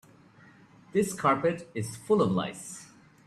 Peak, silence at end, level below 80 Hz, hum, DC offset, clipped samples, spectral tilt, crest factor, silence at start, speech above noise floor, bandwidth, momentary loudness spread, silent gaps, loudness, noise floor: -12 dBFS; 0.4 s; -66 dBFS; none; under 0.1%; under 0.1%; -5.5 dB/octave; 18 dB; 0.95 s; 28 dB; 14 kHz; 15 LU; none; -28 LUFS; -56 dBFS